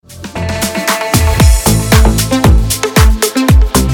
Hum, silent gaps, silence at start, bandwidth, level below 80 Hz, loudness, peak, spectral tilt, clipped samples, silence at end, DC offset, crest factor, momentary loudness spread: none; none; 0.1 s; 20 kHz; -14 dBFS; -10 LUFS; 0 dBFS; -4.5 dB/octave; under 0.1%; 0 s; under 0.1%; 10 dB; 7 LU